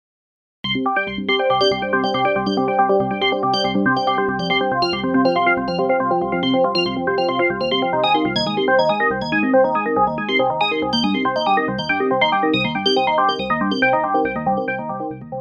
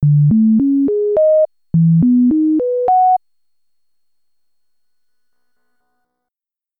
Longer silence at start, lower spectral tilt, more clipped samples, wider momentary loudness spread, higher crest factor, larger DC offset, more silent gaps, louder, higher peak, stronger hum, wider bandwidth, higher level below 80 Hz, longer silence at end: first, 0.65 s vs 0 s; second, -5.5 dB/octave vs -14.5 dB/octave; neither; about the same, 4 LU vs 4 LU; first, 16 dB vs 8 dB; neither; neither; second, -18 LUFS vs -13 LUFS; first, -2 dBFS vs -6 dBFS; neither; first, 9.8 kHz vs 2 kHz; about the same, -52 dBFS vs -50 dBFS; second, 0 s vs 3.6 s